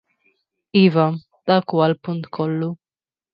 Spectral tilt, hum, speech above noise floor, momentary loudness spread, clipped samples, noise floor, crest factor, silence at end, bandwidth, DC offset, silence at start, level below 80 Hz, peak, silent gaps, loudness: -10 dB/octave; none; over 72 dB; 12 LU; under 0.1%; under -90 dBFS; 18 dB; 0.6 s; 5.4 kHz; under 0.1%; 0.75 s; -68 dBFS; -2 dBFS; none; -20 LUFS